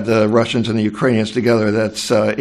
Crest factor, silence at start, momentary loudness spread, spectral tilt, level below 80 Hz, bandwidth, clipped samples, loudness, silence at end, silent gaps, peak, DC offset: 14 dB; 0 s; 3 LU; -6 dB/octave; -52 dBFS; 13.5 kHz; under 0.1%; -16 LUFS; 0 s; none; -2 dBFS; under 0.1%